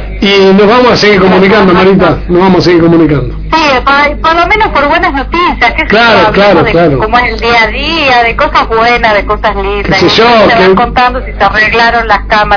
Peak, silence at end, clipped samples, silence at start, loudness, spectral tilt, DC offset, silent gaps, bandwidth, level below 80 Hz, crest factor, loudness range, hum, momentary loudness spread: 0 dBFS; 0 s; 5%; 0 s; -6 LUFS; -6 dB/octave; under 0.1%; none; 5.4 kHz; -22 dBFS; 6 dB; 2 LU; none; 5 LU